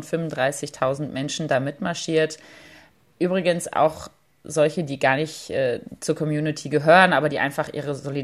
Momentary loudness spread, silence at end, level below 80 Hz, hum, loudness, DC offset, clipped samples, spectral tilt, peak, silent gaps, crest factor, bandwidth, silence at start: 11 LU; 0 s; -62 dBFS; none; -22 LUFS; under 0.1%; under 0.1%; -5 dB/octave; 0 dBFS; none; 22 dB; 14.5 kHz; 0 s